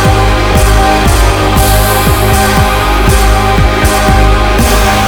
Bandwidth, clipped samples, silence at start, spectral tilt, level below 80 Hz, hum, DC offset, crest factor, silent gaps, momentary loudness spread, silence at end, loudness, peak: over 20 kHz; 2%; 0 s; -4.5 dB/octave; -10 dBFS; none; 0.8%; 8 dB; none; 1 LU; 0 s; -8 LUFS; 0 dBFS